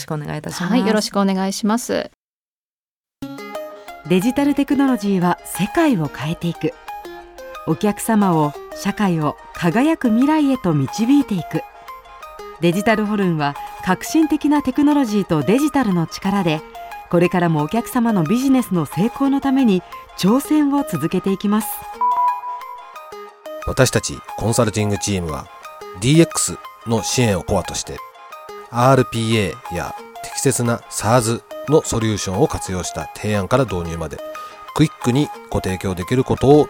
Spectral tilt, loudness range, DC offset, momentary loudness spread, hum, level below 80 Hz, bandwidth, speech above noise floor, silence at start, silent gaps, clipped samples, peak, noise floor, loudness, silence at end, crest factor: -5.5 dB/octave; 3 LU; under 0.1%; 17 LU; none; -44 dBFS; 18.5 kHz; over 72 dB; 0 s; 2.14-3.04 s; under 0.1%; 0 dBFS; under -90 dBFS; -19 LUFS; 0 s; 18 dB